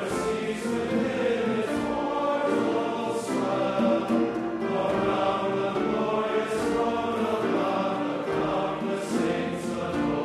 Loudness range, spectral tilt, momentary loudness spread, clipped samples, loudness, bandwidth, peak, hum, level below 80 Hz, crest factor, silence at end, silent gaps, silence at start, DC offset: 1 LU; -5.5 dB/octave; 4 LU; under 0.1%; -27 LUFS; 13.5 kHz; -12 dBFS; none; -56 dBFS; 14 dB; 0 s; none; 0 s; under 0.1%